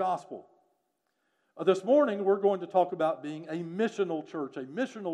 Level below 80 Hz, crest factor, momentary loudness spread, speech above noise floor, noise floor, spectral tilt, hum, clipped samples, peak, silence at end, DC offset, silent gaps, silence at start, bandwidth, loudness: under -90 dBFS; 18 dB; 13 LU; 49 dB; -78 dBFS; -6.5 dB/octave; none; under 0.1%; -12 dBFS; 0 s; under 0.1%; none; 0 s; 9.8 kHz; -29 LUFS